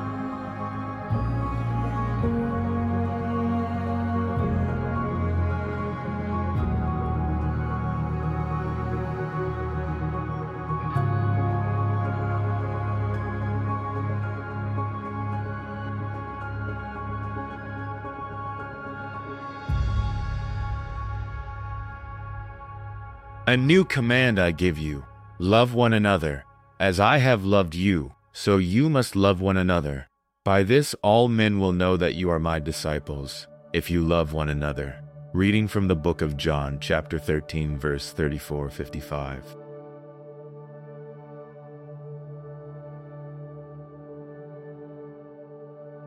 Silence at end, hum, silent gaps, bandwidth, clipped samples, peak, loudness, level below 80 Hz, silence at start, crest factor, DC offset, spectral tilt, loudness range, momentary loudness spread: 0 s; none; none; 15.5 kHz; under 0.1%; -6 dBFS; -26 LUFS; -38 dBFS; 0 s; 20 dB; under 0.1%; -6.5 dB/octave; 16 LU; 21 LU